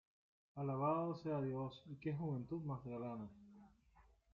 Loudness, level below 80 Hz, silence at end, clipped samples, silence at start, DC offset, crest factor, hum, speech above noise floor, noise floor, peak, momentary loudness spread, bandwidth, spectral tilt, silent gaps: -44 LUFS; -74 dBFS; 0.3 s; under 0.1%; 0.55 s; under 0.1%; 18 dB; none; 28 dB; -71 dBFS; -28 dBFS; 16 LU; 6.8 kHz; -8.5 dB/octave; none